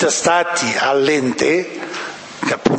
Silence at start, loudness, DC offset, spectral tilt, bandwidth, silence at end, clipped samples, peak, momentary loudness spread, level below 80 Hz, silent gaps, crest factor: 0 s; -17 LUFS; under 0.1%; -3 dB/octave; 8.8 kHz; 0 s; under 0.1%; 0 dBFS; 11 LU; -56 dBFS; none; 18 dB